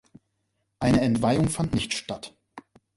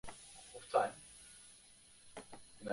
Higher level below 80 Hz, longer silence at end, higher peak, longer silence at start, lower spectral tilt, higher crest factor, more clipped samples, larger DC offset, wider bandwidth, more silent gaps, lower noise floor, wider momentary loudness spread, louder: first, -48 dBFS vs -70 dBFS; first, 0.35 s vs 0 s; first, -10 dBFS vs -18 dBFS; first, 0.8 s vs 0.05 s; first, -5.5 dB/octave vs -3 dB/octave; second, 18 dB vs 24 dB; neither; neither; about the same, 11.5 kHz vs 11.5 kHz; neither; first, -76 dBFS vs -63 dBFS; second, 15 LU vs 23 LU; first, -24 LUFS vs -40 LUFS